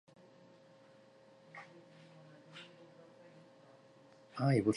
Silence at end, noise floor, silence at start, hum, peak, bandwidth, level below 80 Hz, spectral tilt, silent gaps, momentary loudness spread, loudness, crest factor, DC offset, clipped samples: 0 s; -63 dBFS; 1.55 s; none; -18 dBFS; 11 kHz; -76 dBFS; -7.5 dB/octave; none; 23 LU; -39 LUFS; 24 dB; under 0.1%; under 0.1%